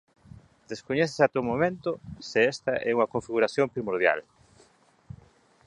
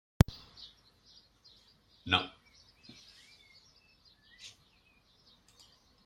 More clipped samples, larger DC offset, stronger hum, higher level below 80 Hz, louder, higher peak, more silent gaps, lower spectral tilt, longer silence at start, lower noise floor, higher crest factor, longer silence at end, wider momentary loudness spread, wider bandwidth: neither; neither; neither; second, -60 dBFS vs -48 dBFS; first, -26 LUFS vs -31 LUFS; about the same, -6 dBFS vs -4 dBFS; neither; about the same, -5.5 dB/octave vs -5 dB/octave; first, 0.7 s vs 0.3 s; second, -61 dBFS vs -67 dBFS; second, 22 dB vs 34 dB; about the same, 1.45 s vs 1.55 s; second, 9 LU vs 29 LU; second, 10.5 kHz vs 16 kHz